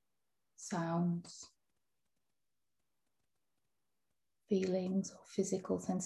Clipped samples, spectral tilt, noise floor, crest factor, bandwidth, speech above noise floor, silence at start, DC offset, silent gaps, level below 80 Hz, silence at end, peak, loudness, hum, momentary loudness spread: under 0.1%; -6 dB/octave; under -90 dBFS; 20 dB; 12 kHz; over 53 dB; 0.6 s; under 0.1%; none; -76 dBFS; 0 s; -22 dBFS; -38 LUFS; none; 16 LU